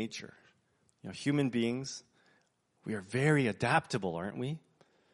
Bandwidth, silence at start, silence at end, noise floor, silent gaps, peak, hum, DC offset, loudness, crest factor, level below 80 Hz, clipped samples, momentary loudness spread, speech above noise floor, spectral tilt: 11.5 kHz; 0 s; 0.55 s; -73 dBFS; none; -12 dBFS; none; under 0.1%; -33 LUFS; 22 dB; -72 dBFS; under 0.1%; 18 LU; 40 dB; -5.5 dB/octave